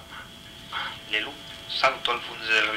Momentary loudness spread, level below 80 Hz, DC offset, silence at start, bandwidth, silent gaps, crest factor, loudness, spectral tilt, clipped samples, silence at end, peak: 18 LU; -58 dBFS; under 0.1%; 0 s; 16 kHz; none; 22 dB; -26 LUFS; -2 dB/octave; under 0.1%; 0 s; -6 dBFS